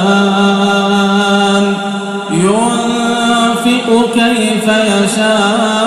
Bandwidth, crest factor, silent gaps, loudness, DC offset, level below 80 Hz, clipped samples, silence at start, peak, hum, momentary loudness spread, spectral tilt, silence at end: 14.5 kHz; 10 dB; none; -11 LUFS; under 0.1%; -50 dBFS; under 0.1%; 0 s; 0 dBFS; none; 3 LU; -4.5 dB/octave; 0 s